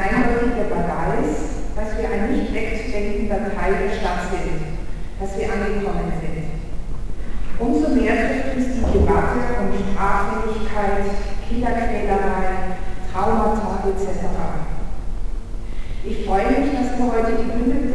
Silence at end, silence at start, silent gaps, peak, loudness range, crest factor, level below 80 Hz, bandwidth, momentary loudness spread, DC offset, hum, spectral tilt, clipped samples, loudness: 0 s; 0 s; none; -4 dBFS; 5 LU; 14 dB; -26 dBFS; 11 kHz; 13 LU; 0.4%; none; -7 dB/octave; under 0.1%; -22 LUFS